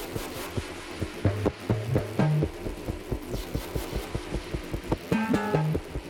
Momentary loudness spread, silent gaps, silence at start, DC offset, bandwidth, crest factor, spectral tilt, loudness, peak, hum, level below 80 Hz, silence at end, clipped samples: 9 LU; none; 0 s; under 0.1%; 18 kHz; 20 dB; -6.5 dB/octave; -30 LUFS; -10 dBFS; none; -40 dBFS; 0 s; under 0.1%